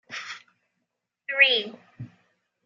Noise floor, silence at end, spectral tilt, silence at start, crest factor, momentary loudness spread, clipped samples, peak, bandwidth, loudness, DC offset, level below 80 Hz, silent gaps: -81 dBFS; 0.6 s; -2.5 dB/octave; 0.1 s; 26 dB; 26 LU; under 0.1%; -4 dBFS; 13.5 kHz; -20 LUFS; under 0.1%; -78 dBFS; none